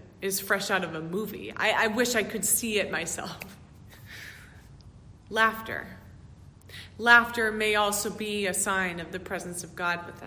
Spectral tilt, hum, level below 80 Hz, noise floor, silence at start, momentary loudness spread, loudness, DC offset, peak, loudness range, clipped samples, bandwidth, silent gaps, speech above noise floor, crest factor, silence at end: -2.5 dB/octave; none; -56 dBFS; -50 dBFS; 0 s; 19 LU; -26 LUFS; under 0.1%; -6 dBFS; 8 LU; under 0.1%; 16 kHz; none; 22 dB; 24 dB; 0 s